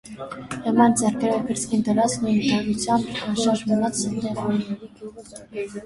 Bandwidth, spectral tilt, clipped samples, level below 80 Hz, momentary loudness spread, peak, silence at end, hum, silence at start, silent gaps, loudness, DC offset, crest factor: 11.5 kHz; -4.5 dB/octave; under 0.1%; -54 dBFS; 17 LU; -4 dBFS; 0 s; none; 0.05 s; none; -22 LUFS; under 0.1%; 18 dB